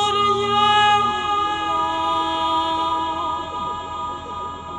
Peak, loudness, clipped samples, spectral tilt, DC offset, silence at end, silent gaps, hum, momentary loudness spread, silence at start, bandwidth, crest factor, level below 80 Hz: -6 dBFS; -20 LUFS; under 0.1%; -3.5 dB/octave; under 0.1%; 0 s; none; none; 13 LU; 0 s; 10.5 kHz; 16 dB; -48 dBFS